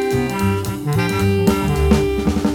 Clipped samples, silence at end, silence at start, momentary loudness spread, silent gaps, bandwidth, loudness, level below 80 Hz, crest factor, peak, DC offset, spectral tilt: under 0.1%; 0 s; 0 s; 4 LU; none; 18.5 kHz; -18 LUFS; -28 dBFS; 16 dB; -2 dBFS; 0.2%; -6.5 dB/octave